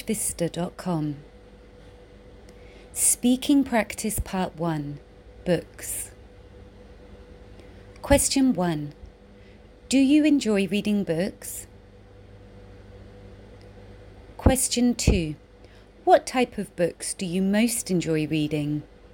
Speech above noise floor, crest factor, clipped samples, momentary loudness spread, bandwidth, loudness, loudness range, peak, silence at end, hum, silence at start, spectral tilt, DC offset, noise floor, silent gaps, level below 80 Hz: 26 dB; 22 dB; under 0.1%; 15 LU; 17 kHz; -24 LUFS; 8 LU; -4 dBFS; 0.25 s; none; 0 s; -4.5 dB/octave; under 0.1%; -50 dBFS; none; -40 dBFS